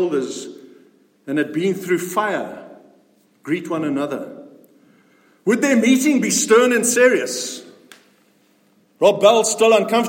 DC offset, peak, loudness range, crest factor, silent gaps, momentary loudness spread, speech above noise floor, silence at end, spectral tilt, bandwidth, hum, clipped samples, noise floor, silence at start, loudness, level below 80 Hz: under 0.1%; -2 dBFS; 8 LU; 18 dB; none; 17 LU; 41 dB; 0 s; -3.5 dB/octave; 16.5 kHz; none; under 0.1%; -58 dBFS; 0 s; -17 LUFS; -72 dBFS